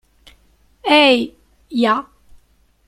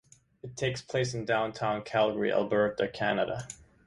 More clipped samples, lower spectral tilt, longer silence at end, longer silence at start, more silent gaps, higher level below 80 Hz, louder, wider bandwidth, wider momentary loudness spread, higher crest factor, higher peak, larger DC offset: neither; about the same, -4 dB/octave vs -5 dB/octave; first, 0.85 s vs 0.25 s; first, 0.85 s vs 0.45 s; neither; first, -56 dBFS vs -62 dBFS; first, -15 LUFS vs -30 LUFS; first, 14 kHz vs 11.5 kHz; first, 16 LU vs 10 LU; about the same, 18 dB vs 18 dB; first, -2 dBFS vs -12 dBFS; neither